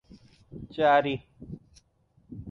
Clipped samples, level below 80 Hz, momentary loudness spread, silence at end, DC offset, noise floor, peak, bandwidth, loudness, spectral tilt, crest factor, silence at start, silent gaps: under 0.1%; -58 dBFS; 24 LU; 0 s; under 0.1%; -66 dBFS; -12 dBFS; 7 kHz; -25 LUFS; -7 dB/octave; 18 dB; 0.55 s; none